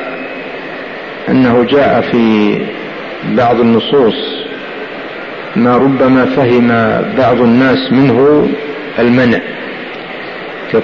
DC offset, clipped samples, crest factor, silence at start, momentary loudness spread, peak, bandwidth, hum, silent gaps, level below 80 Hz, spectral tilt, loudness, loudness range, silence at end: 0.4%; under 0.1%; 12 dB; 0 s; 14 LU; 0 dBFS; 6.4 kHz; none; none; -44 dBFS; -8 dB/octave; -11 LUFS; 3 LU; 0 s